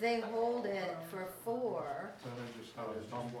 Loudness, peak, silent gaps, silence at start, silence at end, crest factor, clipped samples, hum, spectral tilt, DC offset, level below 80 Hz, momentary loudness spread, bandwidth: -40 LUFS; -22 dBFS; none; 0 s; 0 s; 16 dB; under 0.1%; none; -5.5 dB/octave; under 0.1%; -76 dBFS; 11 LU; 17.5 kHz